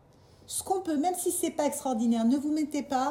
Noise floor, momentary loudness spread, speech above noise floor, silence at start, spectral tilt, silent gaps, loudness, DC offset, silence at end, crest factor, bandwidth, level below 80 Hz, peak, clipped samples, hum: -56 dBFS; 4 LU; 28 dB; 0.5 s; -3.5 dB/octave; none; -29 LUFS; under 0.1%; 0 s; 14 dB; 17.5 kHz; -68 dBFS; -16 dBFS; under 0.1%; none